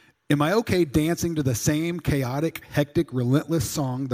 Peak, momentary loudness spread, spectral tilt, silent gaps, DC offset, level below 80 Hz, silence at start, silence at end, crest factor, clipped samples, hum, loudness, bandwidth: -6 dBFS; 5 LU; -5.5 dB/octave; none; under 0.1%; -44 dBFS; 0.3 s; 0 s; 18 dB; under 0.1%; none; -24 LUFS; 16.5 kHz